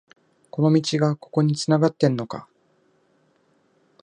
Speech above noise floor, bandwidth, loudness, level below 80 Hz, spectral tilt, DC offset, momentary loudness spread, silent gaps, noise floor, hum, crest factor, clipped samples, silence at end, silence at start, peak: 43 dB; 10 kHz; -21 LUFS; -68 dBFS; -6.5 dB/octave; under 0.1%; 14 LU; none; -64 dBFS; none; 20 dB; under 0.1%; 1.6 s; 0.55 s; -4 dBFS